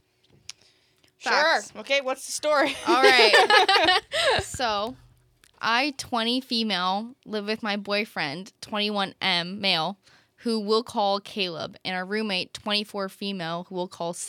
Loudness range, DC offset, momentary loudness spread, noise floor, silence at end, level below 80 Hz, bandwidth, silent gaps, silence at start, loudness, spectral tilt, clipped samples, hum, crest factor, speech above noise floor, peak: 8 LU; under 0.1%; 15 LU; -63 dBFS; 0 s; -60 dBFS; 18.5 kHz; none; 1.2 s; -24 LUFS; -3 dB/octave; under 0.1%; none; 24 dB; 39 dB; -2 dBFS